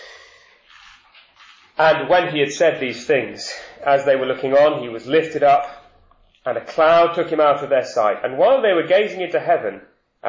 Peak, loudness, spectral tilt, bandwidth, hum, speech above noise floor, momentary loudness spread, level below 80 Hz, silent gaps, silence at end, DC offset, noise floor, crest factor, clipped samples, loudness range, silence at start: -4 dBFS; -18 LUFS; -4.5 dB/octave; 7.6 kHz; none; 37 dB; 12 LU; -60 dBFS; none; 0 s; under 0.1%; -54 dBFS; 14 dB; under 0.1%; 3 LU; 0 s